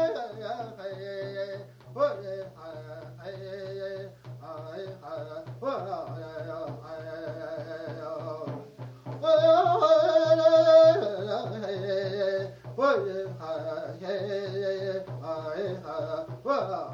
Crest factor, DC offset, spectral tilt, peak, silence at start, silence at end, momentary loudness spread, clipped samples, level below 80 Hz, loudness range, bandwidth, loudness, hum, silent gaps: 20 dB; under 0.1%; -6.5 dB/octave; -8 dBFS; 0 s; 0 s; 20 LU; under 0.1%; -68 dBFS; 15 LU; 7.2 kHz; -27 LUFS; none; none